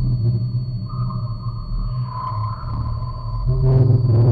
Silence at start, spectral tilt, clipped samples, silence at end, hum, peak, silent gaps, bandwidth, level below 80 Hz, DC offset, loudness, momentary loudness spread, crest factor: 0 s; -11 dB/octave; under 0.1%; 0 s; none; -4 dBFS; none; 4.9 kHz; -28 dBFS; under 0.1%; -21 LUFS; 12 LU; 14 dB